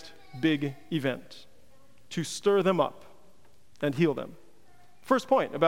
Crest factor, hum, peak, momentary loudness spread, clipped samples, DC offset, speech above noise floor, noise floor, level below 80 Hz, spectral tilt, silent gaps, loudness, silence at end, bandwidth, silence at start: 22 dB; none; -8 dBFS; 17 LU; under 0.1%; 0.4%; 35 dB; -63 dBFS; -70 dBFS; -5.5 dB/octave; none; -29 LUFS; 0 s; 16 kHz; 0.05 s